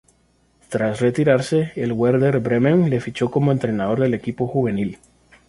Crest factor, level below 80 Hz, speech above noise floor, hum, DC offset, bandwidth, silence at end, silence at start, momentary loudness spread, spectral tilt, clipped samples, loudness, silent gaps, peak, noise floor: 16 dB; -52 dBFS; 41 dB; none; under 0.1%; 11.5 kHz; 0.55 s; 0.7 s; 7 LU; -7.5 dB/octave; under 0.1%; -20 LUFS; none; -2 dBFS; -60 dBFS